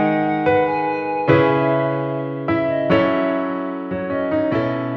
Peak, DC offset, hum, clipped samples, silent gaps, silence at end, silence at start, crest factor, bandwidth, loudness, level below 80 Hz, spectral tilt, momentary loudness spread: -2 dBFS; under 0.1%; none; under 0.1%; none; 0 s; 0 s; 16 dB; 6 kHz; -19 LUFS; -52 dBFS; -9 dB/octave; 8 LU